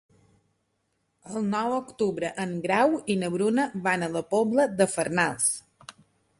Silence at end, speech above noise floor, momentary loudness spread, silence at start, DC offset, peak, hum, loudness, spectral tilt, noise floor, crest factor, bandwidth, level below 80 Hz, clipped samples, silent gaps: 0.5 s; 49 dB; 7 LU; 1.25 s; under 0.1%; -8 dBFS; none; -26 LUFS; -4.5 dB/octave; -75 dBFS; 20 dB; 12 kHz; -68 dBFS; under 0.1%; none